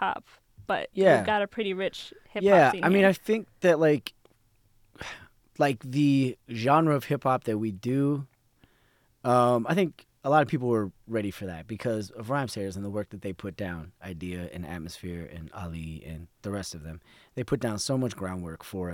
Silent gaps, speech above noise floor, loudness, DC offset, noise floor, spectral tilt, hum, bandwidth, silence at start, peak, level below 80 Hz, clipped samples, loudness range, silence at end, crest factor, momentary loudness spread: none; 39 dB; -27 LUFS; under 0.1%; -66 dBFS; -6 dB/octave; none; 18 kHz; 0 s; -8 dBFS; -56 dBFS; under 0.1%; 13 LU; 0 s; 20 dB; 18 LU